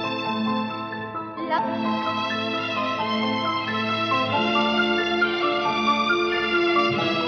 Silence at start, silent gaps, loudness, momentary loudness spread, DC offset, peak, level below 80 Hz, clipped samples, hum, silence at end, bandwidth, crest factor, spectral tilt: 0 s; none; -23 LUFS; 6 LU; under 0.1%; -10 dBFS; -60 dBFS; under 0.1%; none; 0 s; 7.2 kHz; 14 dB; -5 dB/octave